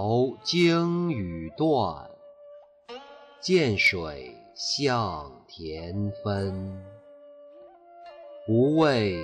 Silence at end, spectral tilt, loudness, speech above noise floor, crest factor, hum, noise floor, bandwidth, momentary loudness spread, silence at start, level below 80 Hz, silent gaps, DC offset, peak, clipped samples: 0 s; -5.5 dB/octave; -25 LUFS; 25 dB; 16 dB; none; -50 dBFS; 11.5 kHz; 22 LU; 0 s; -56 dBFS; none; under 0.1%; -10 dBFS; under 0.1%